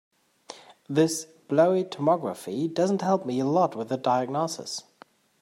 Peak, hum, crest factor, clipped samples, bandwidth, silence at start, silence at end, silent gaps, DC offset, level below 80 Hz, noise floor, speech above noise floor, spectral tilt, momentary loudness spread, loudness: -8 dBFS; none; 18 dB; under 0.1%; 16 kHz; 0.5 s; 0.6 s; none; under 0.1%; -76 dBFS; -56 dBFS; 31 dB; -5.5 dB/octave; 13 LU; -26 LUFS